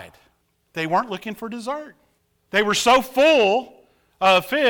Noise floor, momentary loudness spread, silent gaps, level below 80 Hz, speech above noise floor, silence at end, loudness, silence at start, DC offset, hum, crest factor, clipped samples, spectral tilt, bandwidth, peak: -65 dBFS; 15 LU; none; -58 dBFS; 46 dB; 0 s; -19 LUFS; 0 s; under 0.1%; none; 16 dB; under 0.1%; -3 dB/octave; over 20 kHz; -6 dBFS